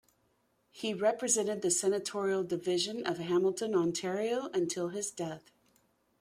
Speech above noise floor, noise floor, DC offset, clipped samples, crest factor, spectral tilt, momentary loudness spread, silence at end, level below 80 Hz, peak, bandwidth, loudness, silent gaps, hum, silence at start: 42 dB; -74 dBFS; under 0.1%; under 0.1%; 18 dB; -3.5 dB/octave; 8 LU; 0.8 s; -76 dBFS; -14 dBFS; 15.5 kHz; -32 LUFS; none; none; 0.75 s